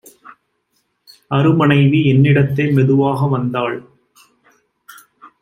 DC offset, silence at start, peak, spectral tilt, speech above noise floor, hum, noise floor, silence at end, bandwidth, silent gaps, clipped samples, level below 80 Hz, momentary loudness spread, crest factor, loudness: under 0.1%; 1.3 s; -2 dBFS; -8.5 dB/octave; 53 dB; none; -66 dBFS; 0.15 s; 6 kHz; none; under 0.1%; -54 dBFS; 9 LU; 14 dB; -14 LUFS